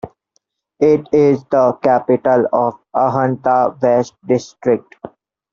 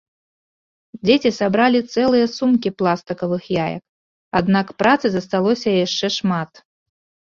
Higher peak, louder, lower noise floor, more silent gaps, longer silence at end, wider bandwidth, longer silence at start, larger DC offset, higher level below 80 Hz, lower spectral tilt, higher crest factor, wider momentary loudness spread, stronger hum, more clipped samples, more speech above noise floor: about the same, -2 dBFS vs -2 dBFS; first, -15 LUFS vs -18 LUFS; second, -66 dBFS vs under -90 dBFS; second, none vs 3.89-4.31 s; second, 0.45 s vs 0.85 s; about the same, 7.4 kHz vs 7.4 kHz; second, 0.05 s vs 0.95 s; neither; about the same, -56 dBFS vs -56 dBFS; first, -7 dB/octave vs -5.5 dB/octave; about the same, 14 dB vs 18 dB; about the same, 6 LU vs 7 LU; neither; neither; second, 51 dB vs over 72 dB